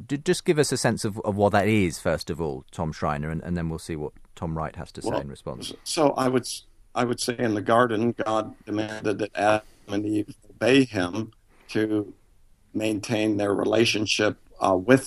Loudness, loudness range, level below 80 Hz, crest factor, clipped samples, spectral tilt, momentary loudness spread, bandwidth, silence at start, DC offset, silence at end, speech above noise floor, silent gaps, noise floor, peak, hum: -25 LUFS; 5 LU; -50 dBFS; 22 dB; under 0.1%; -5 dB/octave; 13 LU; 14 kHz; 0 s; under 0.1%; 0 s; 32 dB; none; -56 dBFS; -2 dBFS; none